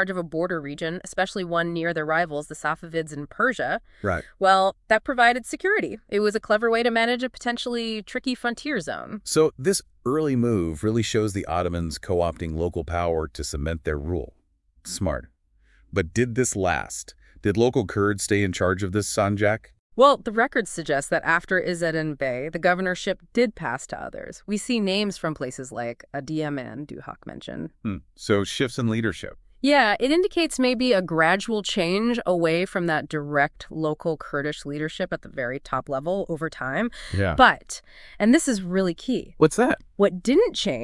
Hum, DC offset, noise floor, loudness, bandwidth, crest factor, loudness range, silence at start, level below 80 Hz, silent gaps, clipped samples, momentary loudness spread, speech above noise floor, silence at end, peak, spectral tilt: none; under 0.1%; -60 dBFS; -24 LUFS; 12 kHz; 24 dB; 7 LU; 0 s; -48 dBFS; 19.79-19.90 s; under 0.1%; 12 LU; 36 dB; 0 s; 0 dBFS; -4.5 dB/octave